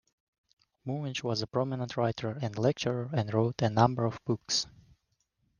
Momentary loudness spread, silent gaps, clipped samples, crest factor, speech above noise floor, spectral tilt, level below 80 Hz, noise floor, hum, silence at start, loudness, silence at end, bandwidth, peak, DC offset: 9 LU; none; under 0.1%; 24 dB; 47 dB; -5.5 dB/octave; -66 dBFS; -77 dBFS; none; 0.85 s; -31 LUFS; 0.9 s; 10 kHz; -8 dBFS; under 0.1%